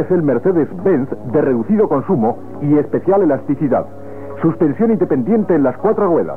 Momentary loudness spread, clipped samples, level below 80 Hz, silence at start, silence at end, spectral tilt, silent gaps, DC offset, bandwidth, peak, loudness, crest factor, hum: 5 LU; under 0.1%; -54 dBFS; 0 s; 0 s; -11.5 dB/octave; none; 2%; 3.4 kHz; -4 dBFS; -16 LUFS; 12 dB; none